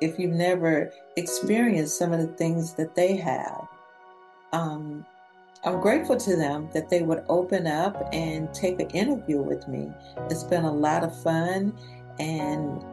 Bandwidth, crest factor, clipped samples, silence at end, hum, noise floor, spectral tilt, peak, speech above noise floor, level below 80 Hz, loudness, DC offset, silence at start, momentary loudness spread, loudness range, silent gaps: 12.5 kHz; 16 dB; under 0.1%; 0 s; none; -53 dBFS; -5.5 dB/octave; -10 dBFS; 27 dB; -58 dBFS; -26 LUFS; under 0.1%; 0 s; 11 LU; 4 LU; none